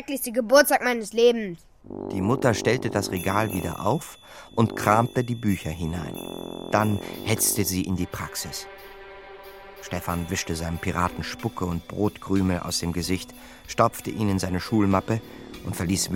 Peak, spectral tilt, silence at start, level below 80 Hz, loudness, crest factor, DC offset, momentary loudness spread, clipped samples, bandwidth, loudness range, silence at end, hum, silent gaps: -4 dBFS; -4.5 dB/octave; 0 s; -48 dBFS; -25 LUFS; 22 dB; 0.1%; 19 LU; under 0.1%; 17 kHz; 6 LU; 0 s; none; none